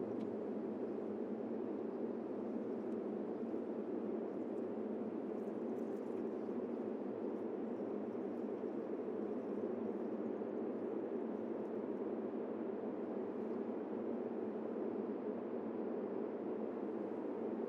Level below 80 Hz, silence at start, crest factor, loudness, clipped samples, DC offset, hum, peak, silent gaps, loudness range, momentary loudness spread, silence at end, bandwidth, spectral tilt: under -90 dBFS; 0 s; 12 dB; -43 LUFS; under 0.1%; under 0.1%; none; -30 dBFS; none; 0 LU; 1 LU; 0 s; 6.4 kHz; -9.5 dB/octave